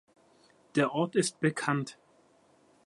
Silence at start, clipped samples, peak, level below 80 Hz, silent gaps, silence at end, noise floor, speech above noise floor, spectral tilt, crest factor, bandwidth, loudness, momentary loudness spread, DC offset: 0.75 s; under 0.1%; -12 dBFS; -78 dBFS; none; 0.95 s; -64 dBFS; 35 dB; -5 dB/octave; 20 dB; 11.5 kHz; -30 LUFS; 6 LU; under 0.1%